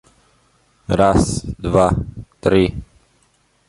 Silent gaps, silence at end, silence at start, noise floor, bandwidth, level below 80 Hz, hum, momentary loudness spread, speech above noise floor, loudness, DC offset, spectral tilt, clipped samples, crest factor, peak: none; 0.85 s; 0.9 s; -60 dBFS; 11.5 kHz; -34 dBFS; none; 16 LU; 44 dB; -17 LUFS; under 0.1%; -6.5 dB/octave; under 0.1%; 18 dB; -2 dBFS